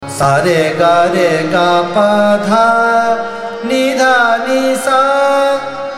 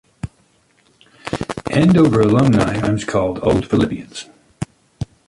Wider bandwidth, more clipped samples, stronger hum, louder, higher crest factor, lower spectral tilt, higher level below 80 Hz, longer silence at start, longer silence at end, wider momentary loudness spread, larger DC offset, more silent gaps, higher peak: first, 15.5 kHz vs 11.5 kHz; neither; neither; first, -11 LUFS vs -16 LUFS; about the same, 12 dB vs 14 dB; second, -4.5 dB/octave vs -7 dB/octave; second, -50 dBFS vs -40 dBFS; second, 0 s vs 0.25 s; second, 0 s vs 0.25 s; second, 5 LU vs 21 LU; neither; neither; about the same, 0 dBFS vs -2 dBFS